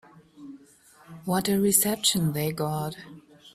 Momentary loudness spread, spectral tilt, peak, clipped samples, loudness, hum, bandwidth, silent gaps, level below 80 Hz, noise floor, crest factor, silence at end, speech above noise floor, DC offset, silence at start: 25 LU; -4 dB/octave; -6 dBFS; under 0.1%; -24 LUFS; none; 16 kHz; none; -60 dBFS; -56 dBFS; 22 dB; 0.05 s; 30 dB; under 0.1%; 0.4 s